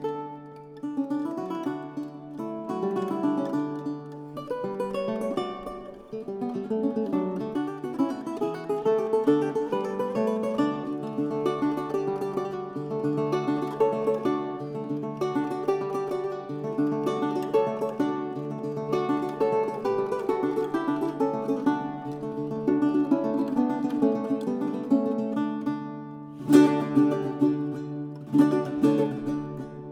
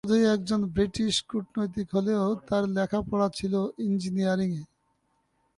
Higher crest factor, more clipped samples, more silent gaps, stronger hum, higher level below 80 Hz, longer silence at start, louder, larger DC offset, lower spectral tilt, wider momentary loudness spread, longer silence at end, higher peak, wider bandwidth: first, 22 dB vs 16 dB; neither; neither; neither; second, -64 dBFS vs -54 dBFS; about the same, 0 s vs 0.05 s; about the same, -27 LUFS vs -27 LUFS; neither; first, -7.5 dB/octave vs -6 dB/octave; first, 11 LU vs 6 LU; second, 0 s vs 0.9 s; first, -4 dBFS vs -12 dBFS; first, 13 kHz vs 11.5 kHz